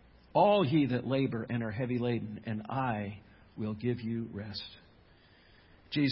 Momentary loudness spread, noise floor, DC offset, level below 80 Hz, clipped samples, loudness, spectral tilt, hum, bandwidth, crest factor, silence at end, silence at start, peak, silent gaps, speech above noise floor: 15 LU; -61 dBFS; under 0.1%; -62 dBFS; under 0.1%; -32 LUFS; -5.5 dB/octave; none; 5.6 kHz; 18 dB; 0 s; 0.35 s; -14 dBFS; none; 29 dB